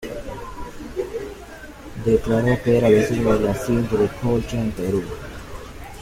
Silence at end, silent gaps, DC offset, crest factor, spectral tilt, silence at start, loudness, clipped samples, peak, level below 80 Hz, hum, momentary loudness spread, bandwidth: 0 s; none; under 0.1%; 18 dB; -7 dB/octave; 0 s; -21 LUFS; under 0.1%; -4 dBFS; -38 dBFS; none; 20 LU; 16 kHz